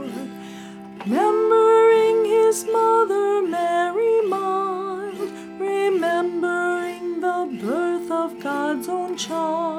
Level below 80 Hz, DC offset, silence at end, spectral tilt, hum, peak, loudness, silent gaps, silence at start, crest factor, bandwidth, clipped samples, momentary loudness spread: -70 dBFS; under 0.1%; 0 s; -4.5 dB/octave; none; -6 dBFS; -21 LUFS; none; 0 s; 14 dB; 15 kHz; under 0.1%; 14 LU